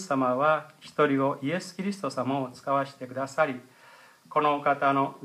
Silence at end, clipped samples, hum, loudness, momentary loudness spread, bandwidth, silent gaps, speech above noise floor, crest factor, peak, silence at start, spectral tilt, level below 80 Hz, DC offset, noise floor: 0 s; under 0.1%; none; -27 LUFS; 9 LU; 14.5 kHz; none; 27 dB; 18 dB; -10 dBFS; 0 s; -6 dB/octave; -80 dBFS; under 0.1%; -54 dBFS